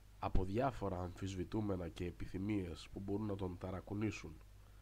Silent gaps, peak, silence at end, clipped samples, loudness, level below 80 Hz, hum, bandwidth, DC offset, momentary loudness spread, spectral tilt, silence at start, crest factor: none; -18 dBFS; 0 s; under 0.1%; -43 LUFS; -50 dBFS; none; 15.5 kHz; under 0.1%; 9 LU; -7 dB/octave; 0 s; 22 dB